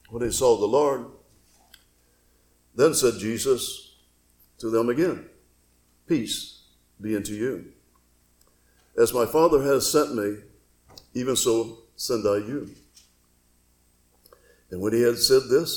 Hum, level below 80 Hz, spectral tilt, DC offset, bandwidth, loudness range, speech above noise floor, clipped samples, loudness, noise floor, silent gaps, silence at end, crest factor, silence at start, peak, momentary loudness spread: 60 Hz at -55 dBFS; -54 dBFS; -4 dB/octave; under 0.1%; 18 kHz; 8 LU; 40 dB; under 0.1%; -24 LUFS; -63 dBFS; none; 0 s; 20 dB; 0.1 s; -6 dBFS; 17 LU